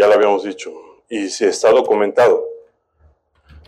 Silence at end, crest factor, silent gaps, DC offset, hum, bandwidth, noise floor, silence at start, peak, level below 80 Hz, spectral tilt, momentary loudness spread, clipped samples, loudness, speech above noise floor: 1.1 s; 14 dB; none; under 0.1%; none; 11.5 kHz; -56 dBFS; 0 s; -4 dBFS; -56 dBFS; -3.5 dB/octave; 17 LU; under 0.1%; -15 LUFS; 40 dB